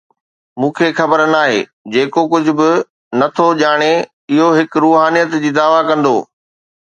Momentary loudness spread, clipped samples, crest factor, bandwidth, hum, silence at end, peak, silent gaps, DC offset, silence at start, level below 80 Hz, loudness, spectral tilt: 7 LU; under 0.1%; 14 dB; 9.2 kHz; none; 0.6 s; 0 dBFS; 1.73-1.85 s, 2.90-3.11 s, 4.13-4.28 s; under 0.1%; 0.55 s; -64 dBFS; -13 LUFS; -5.5 dB/octave